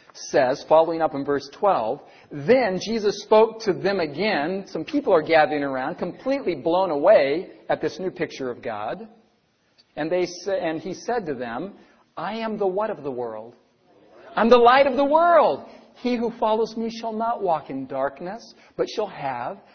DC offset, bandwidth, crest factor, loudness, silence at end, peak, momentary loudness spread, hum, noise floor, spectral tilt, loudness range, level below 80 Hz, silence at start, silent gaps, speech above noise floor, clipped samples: under 0.1%; 6.6 kHz; 20 dB; -22 LUFS; 0.15 s; -2 dBFS; 14 LU; none; -65 dBFS; -5 dB/octave; 9 LU; -60 dBFS; 0.15 s; none; 43 dB; under 0.1%